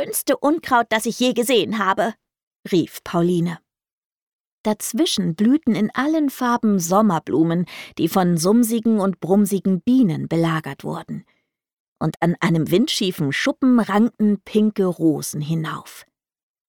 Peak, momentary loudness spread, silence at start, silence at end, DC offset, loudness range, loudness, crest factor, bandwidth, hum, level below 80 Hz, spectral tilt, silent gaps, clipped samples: -4 dBFS; 8 LU; 0 s; 0.65 s; under 0.1%; 4 LU; -20 LUFS; 16 dB; 19 kHz; none; -62 dBFS; -5.5 dB/octave; 2.43-2.51 s, 2.59-2.63 s, 3.93-4.10 s, 4.22-4.64 s, 11.73-11.96 s; under 0.1%